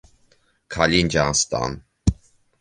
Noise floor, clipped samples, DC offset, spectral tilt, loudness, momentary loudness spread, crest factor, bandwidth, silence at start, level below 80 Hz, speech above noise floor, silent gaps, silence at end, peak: -61 dBFS; under 0.1%; under 0.1%; -3.5 dB/octave; -21 LUFS; 9 LU; 22 dB; 10 kHz; 0.7 s; -36 dBFS; 40 dB; none; 0.45 s; -2 dBFS